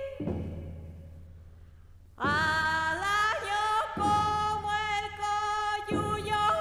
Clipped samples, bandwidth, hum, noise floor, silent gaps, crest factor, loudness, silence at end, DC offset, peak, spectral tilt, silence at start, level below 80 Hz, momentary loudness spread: under 0.1%; 15.5 kHz; none; -52 dBFS; none; 14 dB; -29 LUFS; 0 s; under 0.1%; -18 dBFS; -4 dB/octave; 0 s; -50 dBFS; 15 LU